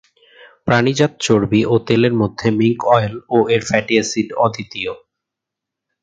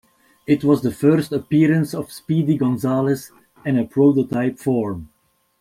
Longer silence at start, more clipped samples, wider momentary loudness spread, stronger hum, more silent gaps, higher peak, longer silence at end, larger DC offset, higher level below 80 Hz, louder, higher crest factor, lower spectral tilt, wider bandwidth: first, 0.65 s vs 0.5 s; neither; about the same, 10 LU vs 10 LU; neither; neither; about the same, 0 dBFS vs -2 dBFS; first, 1.05 s vs 0.55 s; neither; first, -50 dBFS vs -56 dBFS; first, -16 LUFS vs -19 LUFS; about the same, 16 dB vs 16 dB; second, -5.5 dB/octave vs -8 dB/octave; second, 9.2 kHz vs 15.5 kHz